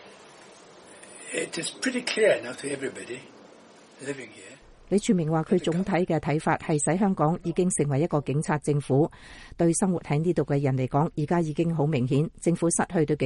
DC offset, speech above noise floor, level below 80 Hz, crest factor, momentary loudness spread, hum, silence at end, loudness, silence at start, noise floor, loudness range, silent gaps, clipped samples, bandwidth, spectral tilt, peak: under 0.1%; 26 dB; -54 dBFS; 18 dB; 13 LU; none; 0 s; -26 LUFS; 0 s; -52 dBFS; 4 LU; none; under 0.1%; 11.5 kHz; -5.5 dB/octave; -8 dBFS